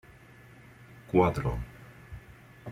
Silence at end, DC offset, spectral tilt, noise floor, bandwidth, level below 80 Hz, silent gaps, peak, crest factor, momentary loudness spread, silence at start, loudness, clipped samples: 0 s; under 0.1%; -8 dB/octave; -53 dBFS; 15.5 kHz; -48 dBFS; none; -10 dBFS; 24 dB; 27 LU; 0.9 s; -28 LUFS; under 0.1%